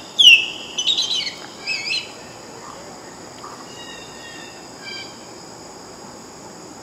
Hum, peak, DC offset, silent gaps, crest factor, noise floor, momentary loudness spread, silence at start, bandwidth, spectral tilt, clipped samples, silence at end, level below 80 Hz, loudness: none; 0 dBFS; under 0.1%; none; 22 dB; -38 dBFS; 24 LU; 0 s; 16 kHz; 0.5 dB/octave; under 0.1%; 0 s; -62 dBFS; -15 LUFS